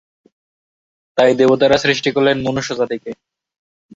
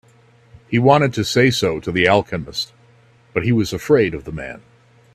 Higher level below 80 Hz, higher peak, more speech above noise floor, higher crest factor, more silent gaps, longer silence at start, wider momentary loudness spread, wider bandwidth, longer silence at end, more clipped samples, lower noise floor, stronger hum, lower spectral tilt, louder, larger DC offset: about the same, -52 dBFS vs -48 dBFS; about the same, -2 dBFS vs 0 dBFS; first, over 75 dB vs 34 dB; about the same, 16 dB vs 18 dB; neither; first, 1.15 s vs 0.7 s; about the same, 14 LU vs 15 LU; second, 8 kHz vs 15.5 kHz; first, 0.85 s vs 0.55 s; neither; first, under -90 dBFS vs -51 dBFS; neither; about the same, -5 dB/octave vs -5.5 dB/octave; about the same, -15 LUFS vs -17 LUFS; neither